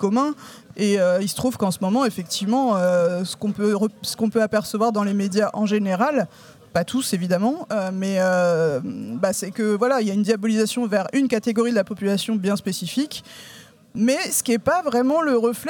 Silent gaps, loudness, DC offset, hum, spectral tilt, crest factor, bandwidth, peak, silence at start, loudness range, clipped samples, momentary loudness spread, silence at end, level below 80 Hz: none; -21 LUFS; under 0.1%; none; -5 dB/octave; 16 dB; 19 kHz; -6 dBFS; 0 s; 2 LU; under 0.1%; 7 LU; 0 s; -62 dBFS